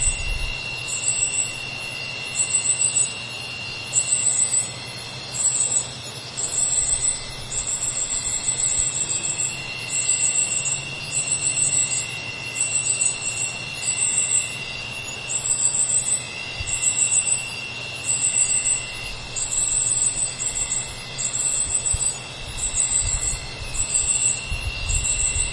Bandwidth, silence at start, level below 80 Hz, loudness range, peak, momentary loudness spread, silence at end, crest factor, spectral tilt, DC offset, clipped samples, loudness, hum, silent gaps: 11.5 kHz; 0 s; -38 dBFS; 2 LU; -6 dBFS; 11 LU; 0 s; 18 dB; 0 dB/octave; under 0.1%; under 0.1%; -21 LUFS; none; none